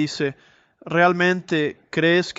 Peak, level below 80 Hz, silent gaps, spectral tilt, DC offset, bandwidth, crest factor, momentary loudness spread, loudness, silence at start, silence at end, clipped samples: -4 dBFS; -64 dBFS; none; -5.5 dB/octave; under 0.1%; 8 kHz; 16 dB; 9 LU; -21 LUFS; 0 s; 0.05 s; under 0.1%